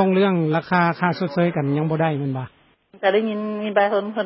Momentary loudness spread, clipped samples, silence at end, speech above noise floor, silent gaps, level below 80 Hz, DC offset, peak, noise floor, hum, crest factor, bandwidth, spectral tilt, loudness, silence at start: 7 LU; under 0.1%; 0 s; 31 dB; none; -64 dBFS; under 0.1%; -4 dBFS; -51 dBFS; none; 18 dB; 5.8 kHz; -11.5 dB/octave; -21 LUFS; 0 s